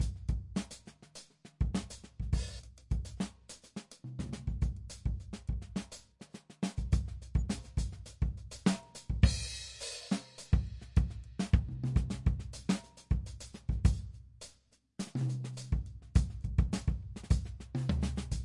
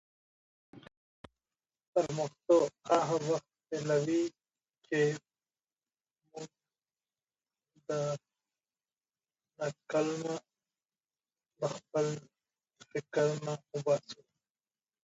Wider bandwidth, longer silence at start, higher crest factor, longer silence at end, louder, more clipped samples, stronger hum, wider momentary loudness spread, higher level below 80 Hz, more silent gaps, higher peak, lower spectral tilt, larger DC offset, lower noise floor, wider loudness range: first, 11.5 kHz vs 8.2 kHz; second, 0 s vs 0.75 s; about the same, 24 dB vs 22 dB; second, 0 s vs 0.9 s; about the same, -36 LUFS vs -34 LUFS; neither; neither; about the same, 17 LU vs 15 LU; first, -38 dBFS vs -78 dBFS; second, none vs 0.97-1.24 s, 1.87-1.93 s; first, -10 dBFS vs -14 dBFS; about the same, -6 dB/octave vs -5.5 dB/octave; neither; second, -67 dBFS vs under -90 dBFS; second, 6 LU vs 12 LU